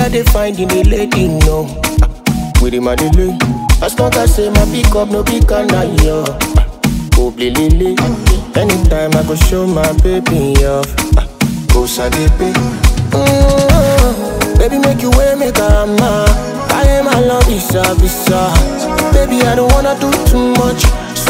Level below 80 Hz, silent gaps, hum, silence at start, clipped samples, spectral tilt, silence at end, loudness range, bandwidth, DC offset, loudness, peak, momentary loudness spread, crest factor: -14 dBFS; none; none; 0 s; 0.4%; -5.5 dB/octave; 0 s; 2 LU; 16.5 kHz; under 0.1%; -12 LUFS; 0 dBFS; 4 LU; 10 dB